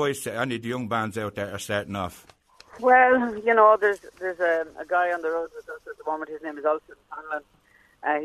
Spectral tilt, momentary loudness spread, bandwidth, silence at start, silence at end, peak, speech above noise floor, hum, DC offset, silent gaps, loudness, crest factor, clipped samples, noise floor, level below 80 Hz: -5 dB/octave; 17 LU; 13.5 kHz; 0 s; 0 s; -4 dBFS; 23 dB; none; under 0.1%; none; -24 LUFS; 20 dB; under 0.1%; -47 dBFS; -62 dBFS